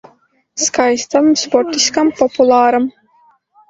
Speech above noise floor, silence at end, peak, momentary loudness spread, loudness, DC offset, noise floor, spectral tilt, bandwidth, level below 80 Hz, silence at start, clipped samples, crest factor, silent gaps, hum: 40 dB; 0.8 s; 0 dBFS; 7 LU; -13 LUFS; under 0.1%; -53 dBFS; -2 dB/octave; 8.2 kHz; -56 dBFS; 0.55 s; under 0.1%; 14 dB; none; none